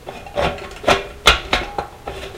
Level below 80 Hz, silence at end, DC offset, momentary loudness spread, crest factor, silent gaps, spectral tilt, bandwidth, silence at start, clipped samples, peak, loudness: -32 dBFS; 0 s; under 0.1%; 15 LU; 20 dB; none; -3 dB/octave; 17 kHz; 0 s; under 0.1%; 0 dBFS; -18 LUFS